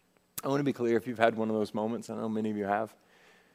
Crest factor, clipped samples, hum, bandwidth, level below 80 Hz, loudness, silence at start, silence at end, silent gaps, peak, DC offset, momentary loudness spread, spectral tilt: 26 dB; under 0.1%; none; 16 kHz; -78 dBFS; -31 LUFS; 0.35 s; 0.65 s; none; -6 dBFS; under 0.1%; 9 LU; -6 dB/octave